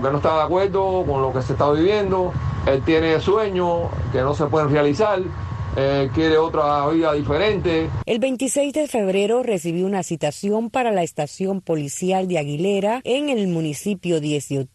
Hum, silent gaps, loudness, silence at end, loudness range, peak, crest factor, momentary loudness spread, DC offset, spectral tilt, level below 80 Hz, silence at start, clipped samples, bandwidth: none; none; -20 LUFS; 0.05 s; 3 LU; -6 dBFS; 14 dB; 6 LU; under 0.1%; -6 dB/octave; -40 dBFS; 0 s; under 0.1%; 12.5 kHz